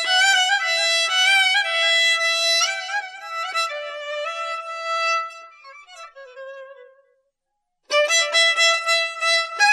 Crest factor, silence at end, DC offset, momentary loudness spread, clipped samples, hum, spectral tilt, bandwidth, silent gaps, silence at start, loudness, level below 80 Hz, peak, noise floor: 16 dB; 0 s; under 0.1%; 14 LU; under 0.1%; none; 6.5 dB/octave; 15.5 kHz; none; 0 s; -18 LUFS; -84 dBFS; -6 dBFS; -77 dBFS